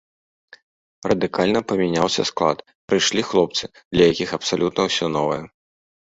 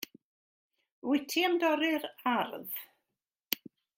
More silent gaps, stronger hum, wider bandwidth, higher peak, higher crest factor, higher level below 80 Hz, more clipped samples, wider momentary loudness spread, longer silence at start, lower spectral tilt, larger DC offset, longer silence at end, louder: second, 2.75-2.88 s, 3.85-3.91 s vs 0.23-0.70 s, 0.91-1.02 s; neither; second, 8 kHz vs 16.5 kHz; first, -2 dBFS vs -8 dBFS; second, 20 dB vs 26 dB; first, -52 dBFS vs -84 dBFS; neither; second, 7 LU vs 13 LU; first, 1.05 s vs 0 s; first, -4 dB/octave vs -2.5 dB/octave; neither; first, 0.65 s vs 0.45 s; first, -20 LUFS vs -32 LUFS